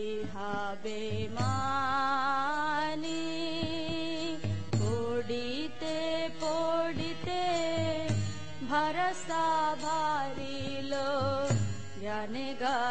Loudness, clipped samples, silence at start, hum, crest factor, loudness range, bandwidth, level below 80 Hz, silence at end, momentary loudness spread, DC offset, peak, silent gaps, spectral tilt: -33 LUFS; under 0.1%; 0 s; none; 16 dB; 2 LU; 8.8 kHz; -58 dBFS; 0 s; 7 LU; 1%; -16 dBFS; none; -5 dB/octave